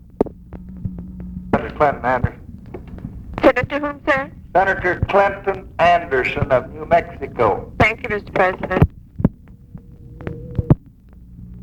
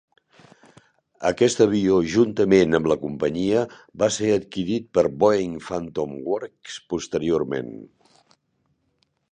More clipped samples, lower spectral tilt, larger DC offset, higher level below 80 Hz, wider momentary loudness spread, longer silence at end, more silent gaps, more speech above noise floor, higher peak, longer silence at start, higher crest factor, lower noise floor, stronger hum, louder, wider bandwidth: neither; first, -7.5 dB/octave vs -5.5 dB/octave; neither; first, -36 dBFS vs -54 dBFS; first, 18 LU vs 12 LU; second, 0 s vs 1.45 s; neither; second, 25 dB vs 49 dB; about the same, 0 dBFS vs -2 dBFS; second, 0.2 s vs 1.2 s; about the same, 20 dB vs 20 dB; second, -43 dBFS vs -70 dBFS; neither; first, -19 LUFS vs -22 LUFS; first, 14 kHz vs 9.6 kHz